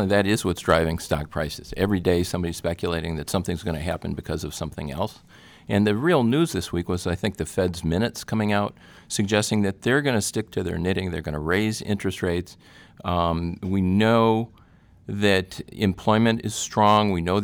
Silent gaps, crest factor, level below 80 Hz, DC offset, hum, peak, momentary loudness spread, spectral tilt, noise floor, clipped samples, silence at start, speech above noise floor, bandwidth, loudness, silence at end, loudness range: none; 18 dB; -44 dBFS; under 0.1%; none; -6 dBFS; 10 LU; -5.5 dB/octave; -53 dBFS; under 0.1%; 0 s; 30 dB; over 20 kHz; -24 LUFS; 0 s; 4 LU